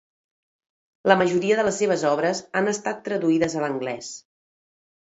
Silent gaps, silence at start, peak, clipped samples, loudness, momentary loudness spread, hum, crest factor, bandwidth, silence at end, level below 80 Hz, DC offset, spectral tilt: none; 1.05 s; 0 dBFS; under 0.1%; -23 LUFS; 11 LU; none; 24 dB; 8 kHz; 0.85 s; -66 dBFS; under 0.1%; -4.5 dB/octave